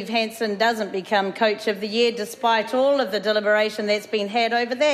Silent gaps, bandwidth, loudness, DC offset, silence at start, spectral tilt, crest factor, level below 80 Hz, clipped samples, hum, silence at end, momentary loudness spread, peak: none; 14 kHz; -22 LUFS; under 0.1%; 0 s; -3.5 dB/octave; 14 dB; -74 dBFS; under 0.1%; none; 0 s; 4 LU; -8 dBFS